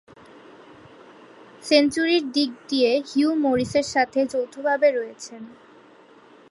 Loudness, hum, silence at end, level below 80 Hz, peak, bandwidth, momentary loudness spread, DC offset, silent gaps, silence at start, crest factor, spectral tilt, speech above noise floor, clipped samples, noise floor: -22 LUFS; none; 0.95 s; -60 dBFS; -4 dBFS; 11.5 kHz; 19 LU; under 0.1%; none; 1.6 s; 20 dB; -4 dB/octave; 29 dB; under 0.1%; -51 dBFS